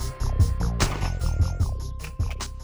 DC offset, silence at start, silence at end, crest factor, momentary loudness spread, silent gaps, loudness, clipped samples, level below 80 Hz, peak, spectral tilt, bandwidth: under 0.1%; 0 s; 0 s; 18 dB; 7 LU; none; -27 LUFS; under 0.1%; -28 dBFS; -6 dBFS; -5 dB/octave; over 20 kHz